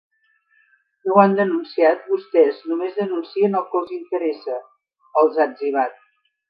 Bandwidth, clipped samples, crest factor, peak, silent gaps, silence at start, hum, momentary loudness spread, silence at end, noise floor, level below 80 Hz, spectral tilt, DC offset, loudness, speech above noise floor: 5.2 kHz; under 0.1%; 20 dB; 0 dBFS; none; 1.05 s; none; 11 LU; 0.6 s; -63 dBFS; -78 dBFS; -10 dB/octave; under 0.1%; -20 LUFS; 44 dB